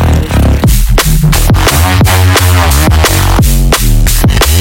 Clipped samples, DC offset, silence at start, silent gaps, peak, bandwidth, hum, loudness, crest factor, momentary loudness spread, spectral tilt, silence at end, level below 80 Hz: 0.5%; under 0.1%; 0 s; none; 0 dBFS; 19.5 kHz; none; -8 LUFS; 6 dB; 3 LU; -4.5 dB/octave; 0 s; -10 dBFS